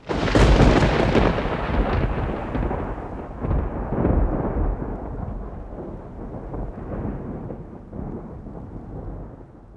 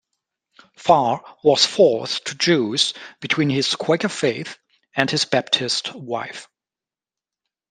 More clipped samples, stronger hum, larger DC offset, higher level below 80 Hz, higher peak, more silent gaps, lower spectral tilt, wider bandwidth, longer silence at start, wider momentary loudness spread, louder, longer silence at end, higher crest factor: neither; neither; neither; first, -28 dBFS vs -66 dBFS; about the same, -2 dBFS vs 0 dBFS; neither; first, -7 dB/octave vs -3.5 dB/octave; about the same, 10.5 kHz vs 10.5 kHz; second, 0 s vs 0.8 s; first, 19 LU vs 12 LU; second, -23 LUFS vs -19 LUFS; second, 0 s vs 1.25 s; about the same, 22 dB vs 22 dB